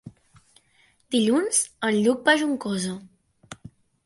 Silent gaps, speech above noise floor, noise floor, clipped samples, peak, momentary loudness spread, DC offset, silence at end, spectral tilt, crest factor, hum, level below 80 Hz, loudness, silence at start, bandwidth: none; 40 dB; -62 dBFS; under 0.1%; -6 dBFS; 23 LU; under 0.1%; 0.5 s; -3 dB/octave; 20 dB; none; -66 dBFS; -23 LUFS; 0.05 s; 11.5 kHz